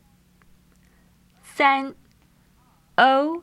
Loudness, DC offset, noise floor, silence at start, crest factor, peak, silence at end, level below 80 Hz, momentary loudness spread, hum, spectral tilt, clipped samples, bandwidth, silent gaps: -20 LUFS; under 0.1%; -59 dBFS; 1.55 s; 22 dB; -4 dBFS; 0 s; -64 dBFS; 17 LU; none; -4 dB/octave; under 0.1%; 13.5 kHz; none